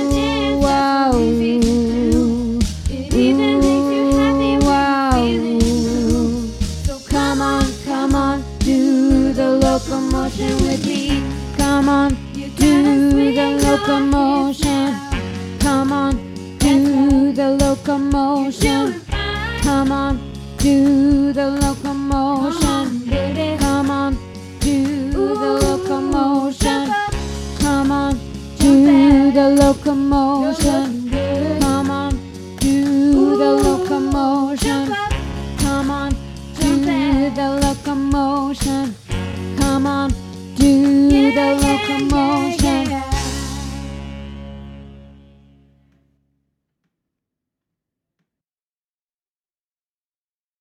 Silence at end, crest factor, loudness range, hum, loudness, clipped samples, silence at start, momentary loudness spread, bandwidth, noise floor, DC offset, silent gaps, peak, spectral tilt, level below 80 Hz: 5.6 s; 16 dB; 5 LU; none; -17 LUFS; under 0.1%; 0 s; 11 LU; 15.5 kHz; under -90 dBFS; under 0.1%; none; 0 dBFS; -5.5 dB/octave; -28 dBFS